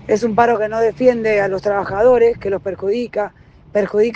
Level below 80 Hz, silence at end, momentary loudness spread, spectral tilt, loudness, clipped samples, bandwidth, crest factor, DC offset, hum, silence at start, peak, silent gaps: -46 dBFS; 0 s; 9 LU; -6.5 dB/octave; -16 LUFS; under 0.1%; 8 kHz; 14 dB; under 0.1%; none; 0 s; -2 dBFS; none